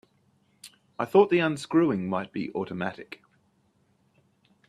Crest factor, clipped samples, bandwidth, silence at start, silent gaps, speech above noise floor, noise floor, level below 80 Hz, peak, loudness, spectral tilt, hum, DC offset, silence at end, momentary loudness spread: 22 dB; under 0.1%; 13 kHz; 0.65 s; none; 42 dB; -68 dBFS; -70 dBFS; -6 dBFS; -26 LUFS; -6.5 dB/octave; none; under 0.1%; 1.55 s; 23 LU